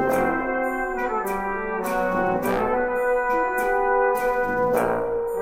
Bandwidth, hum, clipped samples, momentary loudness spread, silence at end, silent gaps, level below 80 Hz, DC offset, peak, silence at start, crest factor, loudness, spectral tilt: 16.5 kHz; none; under 0.1%; 5 LU; 0 s; none; -44 dBFS; under 0.1%; -8 dBFS; 0 s; 14 dB; -23 LUFS; -6 dB/octave